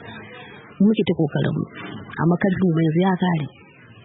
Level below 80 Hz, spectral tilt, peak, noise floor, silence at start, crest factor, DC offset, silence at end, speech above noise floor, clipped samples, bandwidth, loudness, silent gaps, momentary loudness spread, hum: -56 dBFS; -12.5 dB/octave; -8 dBFS; -41 dBFS; 0 s; 14 dB; under 0.1%; 0.55 s; 22 dB; under 0.1%; 4 kHz; -21 LUFS; none; 19 LU; none